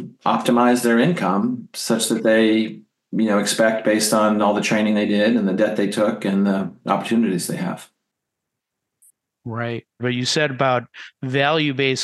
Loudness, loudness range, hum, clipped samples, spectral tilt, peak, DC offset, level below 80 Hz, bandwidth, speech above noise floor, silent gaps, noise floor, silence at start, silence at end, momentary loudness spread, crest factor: -19 LUFS; 7 LU; none; under 0.1%; -4.5 dB/octave; -4 dBFS; under 0.1%; -72 dBFS; 12.5 kHz; 62 dB; none; -81 dBFS; 0 s; 0 s; 11 LU; 16 dB